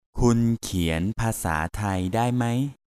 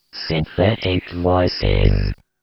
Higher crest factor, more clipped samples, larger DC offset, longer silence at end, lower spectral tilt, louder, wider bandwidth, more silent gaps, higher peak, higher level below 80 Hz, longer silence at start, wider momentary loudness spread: about the same, 18 dB vs 16 dB; neither; neither; second, 0.15 s vs 0.3 s; second, -6 dB/octave vs -8.5 dB/octave; second, -25 LUFS vs -19 LUFS; first, 15 kHz vs 6 kHz; neither; second, -6 dBFS vs -2 dBFS; second, -38 dBFS vs -26 dBFS; about the same, 0.15 s vs 0.15 s; about the same, 5 LU vs 5 LU